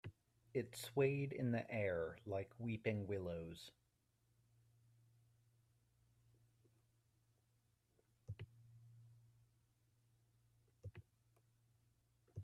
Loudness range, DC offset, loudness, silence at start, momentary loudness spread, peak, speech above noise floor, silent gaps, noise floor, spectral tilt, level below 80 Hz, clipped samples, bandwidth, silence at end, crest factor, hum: 23 LU; under 0.1%; -44 LUFS; 0.05 s; 20 LU; -26 dBFS; 39 dB; none; -82 dBFS; -6.5 dB/octave; -78 dBFS; under 0.1%; 13.5 kHz; 0 s; 24 dB; none